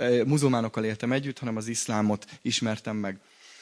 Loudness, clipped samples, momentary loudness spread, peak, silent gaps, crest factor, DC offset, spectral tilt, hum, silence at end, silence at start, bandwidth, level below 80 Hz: -28 LUFS; under 0.1%; 9 LU; -10 dBFS; none; 16 dB; under 0.1%; -5 dB/octave; none; 0 s; 0 s; 11 kHz; -70 dBFS